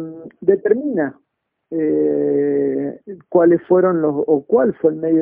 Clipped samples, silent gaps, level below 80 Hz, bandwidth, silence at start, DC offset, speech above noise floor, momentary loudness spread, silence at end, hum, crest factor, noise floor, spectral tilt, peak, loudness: under 0.1%; none; -60 dBFS; 2.7 kHz; 0 s; under 0.1%; 37 dB; 11 LU; 0 s; none; 16 dB; -53 dBFS; -10 dB/octave; -2 dBFS; -17 LUFS